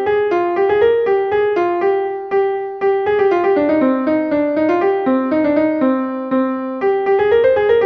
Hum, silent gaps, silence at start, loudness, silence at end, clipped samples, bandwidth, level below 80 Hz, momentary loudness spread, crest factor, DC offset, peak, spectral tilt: none; none; 0 s; -16 LUFS; 0 s; under 0.1%; 5.8 kHz; -52 dBFS; 5 LU; 12 dB; under 0.1%; -4 dBFS; -7.5 dB/octave